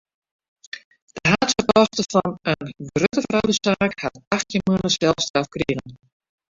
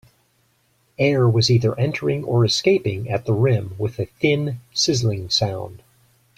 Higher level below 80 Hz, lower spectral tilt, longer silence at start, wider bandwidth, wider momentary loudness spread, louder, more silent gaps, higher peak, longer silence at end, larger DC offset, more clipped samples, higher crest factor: about the same, -50 dBFS vs -52 dBFS; about the same, -4.5 dB/octave vs -5.5 dB/octave; second, 0.75 s vs 1 s; second, 7.8 kHz vs 12 kHz; first, 12 LU vs 9 LU; about the same, -21 LUFS vs -20 LUFS; first, 0.84-0.91 s, 1.02-1.07 s, 4.27-4.31 s, 5.30-5.34 s vs none; about the same, -2 dBFS vs -4 dBFS; about the same, 0.55 s vs 0.6 s; neither; neither; about the same, 20 dB vs 16 dB